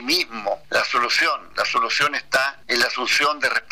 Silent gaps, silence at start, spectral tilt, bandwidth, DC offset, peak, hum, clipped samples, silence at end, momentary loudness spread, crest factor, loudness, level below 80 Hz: none; 0 s; -1 dB/octave; 15.5 kHz; 0.5%; -10 dBFS; none; under 0.1%; 0.1 s; 4 LU; 12 dB; -20 LUFS; -58 dBFS